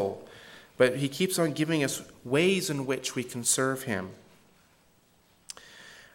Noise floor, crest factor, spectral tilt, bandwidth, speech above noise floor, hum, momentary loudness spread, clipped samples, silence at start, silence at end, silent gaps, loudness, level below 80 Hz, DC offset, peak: -64 dBFS; 22 dB; -4 dB/octave; 17 kHz; 36 dB; none; 21 LU; under 0.1%; 0 s; 0.1 s; none; -28 LUFS; -70 dBFS; under 0.1%; -10 dBFS